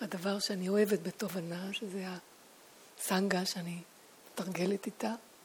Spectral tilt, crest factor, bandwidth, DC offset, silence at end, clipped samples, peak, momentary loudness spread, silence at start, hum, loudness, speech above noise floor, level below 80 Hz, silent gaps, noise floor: -4.5 dB/octave; 20 dB; over 20 kHz; under 0.1%; 0 s; under 0.1%; -16 dBFS; 14 LU; 0 s; none; -35 LUFS; 24 dB; -82 dBFS; none; -58 dBFS